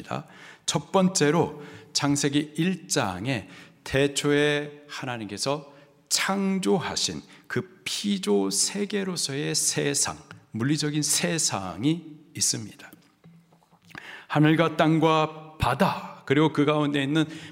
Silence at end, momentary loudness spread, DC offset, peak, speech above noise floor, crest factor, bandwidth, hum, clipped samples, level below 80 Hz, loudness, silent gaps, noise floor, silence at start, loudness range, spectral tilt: 0 s; 14 LU; under 0.1%; -6 dBFS; 33 dB; 20 dB; 16 kHz; none; under 0.1%; -56 dBFS; -25 LUFS; none; -58 dBFS; 0 s; 4 LU; -4 dB/octave